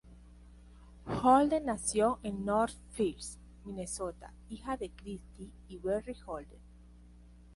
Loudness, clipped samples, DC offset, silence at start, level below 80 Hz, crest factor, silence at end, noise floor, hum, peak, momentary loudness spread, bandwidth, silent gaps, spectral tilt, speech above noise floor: -33 LUFS; under 0.1%; under 0.1%; 0.05 s; -54 dBFS; 20 dB; 0 s; -56 dBFS; 60 Hz at -50 dBFS; -14 dBFS; 23 LU; 11.5 kHz; none; -5 dB/octave; 23 dB